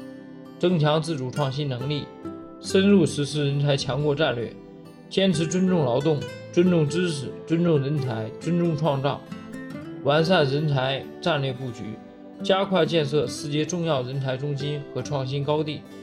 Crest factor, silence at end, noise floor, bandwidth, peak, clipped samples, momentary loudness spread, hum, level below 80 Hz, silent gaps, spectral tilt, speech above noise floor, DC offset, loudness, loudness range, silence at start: 18 dB; 0 s; -44 dBFS; 11.5 kHz; -6 dBFS; under 0.1%; 16 LU; none; -60 dBFS; none; -6 dB/octave; 21 dB; under 0.1%; -24 LUFS; 2 LU; 0 s